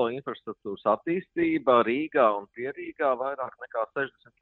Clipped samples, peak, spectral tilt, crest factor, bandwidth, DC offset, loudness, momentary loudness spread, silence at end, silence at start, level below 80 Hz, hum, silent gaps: under 0.1%; -8 dBFS; -9 dB/octave; 20 dB; 4.3 kHz; under 0.1%; -27 LUFS; 13 LU; 0.3 s; 0 s; -68 dBFS; none; none